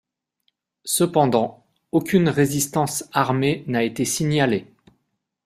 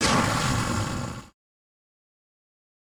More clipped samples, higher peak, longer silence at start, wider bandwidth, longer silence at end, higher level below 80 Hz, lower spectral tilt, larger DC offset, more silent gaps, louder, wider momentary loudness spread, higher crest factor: neither; first, -2 dBFS vs -8 dBFS; first, 0.85 s vs 0 s; second, 15.5 kHz vs over 20 kHz; second, 0.85 s vs 1.7 s; second, -58 dBFS vs -44 dBFS; about the same, -5 dB/octave vs -4 dB/octave; neither; neither; first, -21 LUFS vs -25 LUFS; second, 6 LU vs 14 LU; about the same, 20 dB vs 20 dB